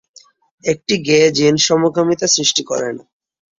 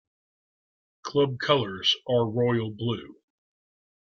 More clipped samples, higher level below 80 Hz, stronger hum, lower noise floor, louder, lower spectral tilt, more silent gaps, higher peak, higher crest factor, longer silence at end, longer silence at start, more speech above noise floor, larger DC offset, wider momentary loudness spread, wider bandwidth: neither; first, -56 dBFS vs -66 dBFS; neither; second, -48 dBFS vs under -90 dBFS; first, -15 LUFS vs -26 LUFS; second, -3 dB/octave vs -5.5 dB/octave; neither; first, 0 dBFS vs -6 dBFS; second, 16 dB vs 22 dB; second, 0.6 s vs 0.9 s; second, 0.65 s vs 1.05 s; second, 33 dB vs over 65 dB; neither; about the same, 10 LU vs 8 LU; about the same, 7.6 kHz vs 7.2 kHz